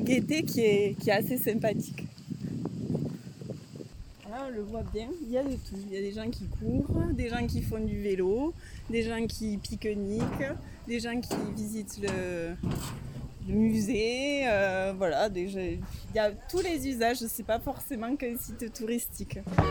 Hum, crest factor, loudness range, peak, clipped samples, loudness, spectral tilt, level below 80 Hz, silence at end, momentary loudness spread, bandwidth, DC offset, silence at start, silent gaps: none; 20 dB; 7 LU; -10 dBFS; under 0.1%; -31 LUFS; -5.5 dB/octave; -44 dBFS; 0 s; 12 LU; 19 kHz; under 0.1%; 0 s; none